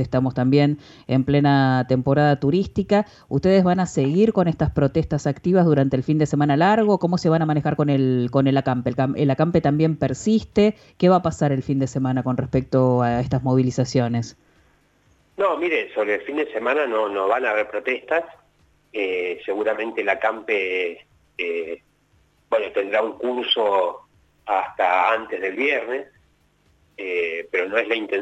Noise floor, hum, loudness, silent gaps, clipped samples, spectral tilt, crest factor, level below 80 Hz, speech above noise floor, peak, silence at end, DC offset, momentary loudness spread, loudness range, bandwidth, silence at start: -61 dBFS; none; -21 LUFS; none; under 0.1%; -7 dB/octave; 16 dB; -48 dBFS; 41 dB; -4 dBFS; 0 s; under 0.1%; 8 LU; 5 LU; 8 kHz; 0 s